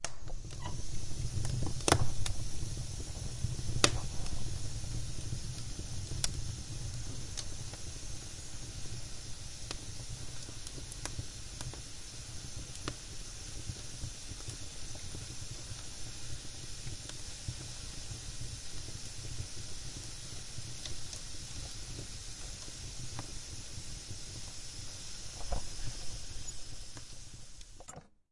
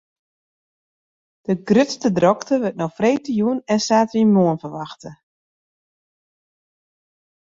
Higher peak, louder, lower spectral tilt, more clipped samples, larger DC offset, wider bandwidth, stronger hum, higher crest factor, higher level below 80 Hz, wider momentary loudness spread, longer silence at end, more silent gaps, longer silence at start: about the same, -4 dBFS vs -2 dBFS; second, -41 LUFS vs -19 LUFS; second, -3 dB/octave vs -6 dB/octave; neither; neither; first, 11.5 kHz vs 7.8 kHz; neither; first, 32 dB vs 20 dB; first, -46 dBFS vs -62 dBFS; second, 8 LU vs 15 LU; second, 0.15 s vs 2.25 s; neither; second, 0 s vs 1.5 s